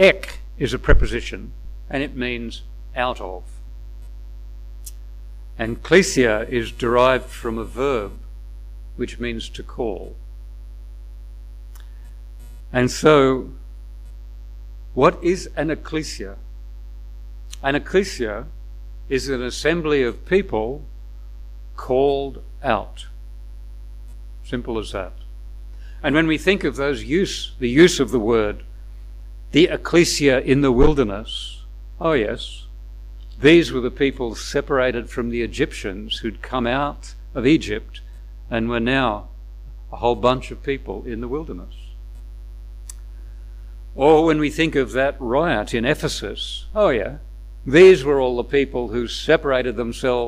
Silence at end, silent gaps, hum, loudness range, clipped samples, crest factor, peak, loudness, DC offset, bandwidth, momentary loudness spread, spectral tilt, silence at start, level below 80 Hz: 0 s; none; 50 Hz at -35 dBFS; 11 LU; under 0.1%; 20 dB; -2 dBFS; -20 LUFS; under 0.1%; 15.5 kHz; 24 LU; -5 dB/octave; 0 s; -32 dBFS